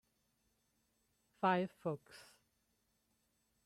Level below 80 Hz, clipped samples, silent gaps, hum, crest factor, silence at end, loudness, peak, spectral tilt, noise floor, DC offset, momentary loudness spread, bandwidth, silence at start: -84 dBFS; under 0.1%; none; none; 24 dB; 1.45 s; -39 LUFS; -22 dBFS; -7 dB/octave; -81 dBFS; under 0.1%; 24 LU; 14 kHz; 1.4 s